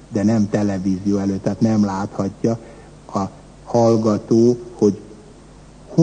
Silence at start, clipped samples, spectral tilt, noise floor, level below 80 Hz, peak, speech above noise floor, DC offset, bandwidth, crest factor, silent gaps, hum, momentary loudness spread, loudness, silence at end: 0.1 s; under 0.1%; -7.5 dB/octave; -43 dBFS; -48 dBFS; -2 dBFS; 25 dB; under 0.1%; 9.4 kHz; 16 dB; none; none; 10 LU; -19 LUFS; 0 s